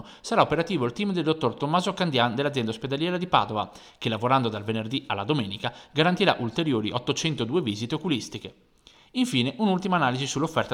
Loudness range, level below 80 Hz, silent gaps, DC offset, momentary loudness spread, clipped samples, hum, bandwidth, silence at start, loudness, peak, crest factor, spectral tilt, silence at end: 2 LU; -60 dBFS; none; under 0.1%; 7 LU; under 0.1%; none; 14.5 kHz; 0 s; -26 LUFS; -4 dBFS; 22 dB; -5 dB/octave; 0 s